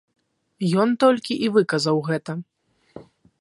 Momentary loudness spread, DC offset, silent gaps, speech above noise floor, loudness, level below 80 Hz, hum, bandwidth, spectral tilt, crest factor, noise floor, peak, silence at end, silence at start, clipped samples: 10 LU; under 0.1%; none; 26 dB; -21 LUFS; -70 dBFS; none; 11.5 kHz; -6 dB/octave; 20 dB; -46 dBFS; -4 dBFS; 0.4 s; 0.6 s; under 0.1%